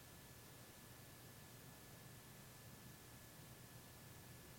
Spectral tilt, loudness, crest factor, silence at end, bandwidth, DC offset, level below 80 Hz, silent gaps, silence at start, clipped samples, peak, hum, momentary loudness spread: -3.5 dB/octave; -59 LUFS; 14 dB; 0 s; 17 kHz; under 0.1%; -74 dBFS; none; 0 s; under 0.1%; -46 dBFS; none; 1 LU